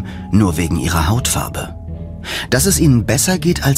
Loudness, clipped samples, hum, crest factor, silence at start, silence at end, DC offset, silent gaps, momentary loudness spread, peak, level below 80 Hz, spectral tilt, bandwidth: -15 LUFS; under 0.1%; none; 16 dB; 0 s; 0 s; under 0.1%; none; 15 LU; 0 dBFS; -28 dBFS; -4.5 dB/octave; 16 kHz